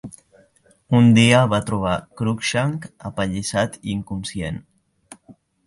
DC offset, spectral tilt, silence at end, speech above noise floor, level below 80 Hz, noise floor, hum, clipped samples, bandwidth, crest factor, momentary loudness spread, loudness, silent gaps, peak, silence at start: under 0.1%; -5.5 dB/octave; 0.35 s; 38 dB; -46 dBFS; -57 dBFS; none; under 0.1%; 11.5 kHz; 18 dB; 17 LU; -20 LUFS; none; -2 dBFS; 0.05 s